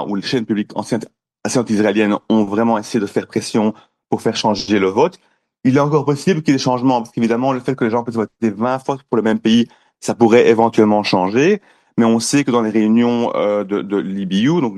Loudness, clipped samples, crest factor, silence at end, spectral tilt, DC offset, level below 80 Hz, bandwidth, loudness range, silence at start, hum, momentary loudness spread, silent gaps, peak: -16 LUFS; under 0.1%; 16 dB; 0 s; -5.5 dB/octave; under 0.1%; -58 dBFS; 12.5 kHz; 4 LU; 0 s; none; 7 LU; none; 0 dBFS